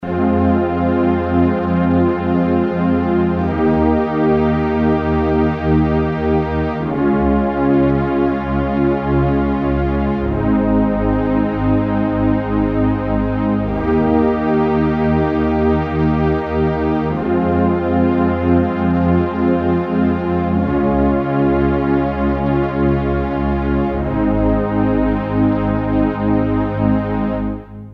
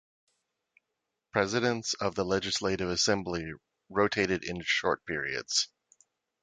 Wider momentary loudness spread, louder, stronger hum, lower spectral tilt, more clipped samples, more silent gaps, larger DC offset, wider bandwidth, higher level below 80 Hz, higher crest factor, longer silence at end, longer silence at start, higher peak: second, 3 LU vs 8 LU; first, -16 LUFS vs -30 LUFS; neither; first, -10.5 dB/octave vs -3 dB/octave; neither; neither; neither; second, 5.6 kHz vs 9.6 kHz; first, -28 dBFS vs -58 dBFS; second, 14 dB vs 22 dB; second, 0 s vs 0.75 s; second, 0 s vs 1.35 s; first, -2 dBFS vs -10 dBFS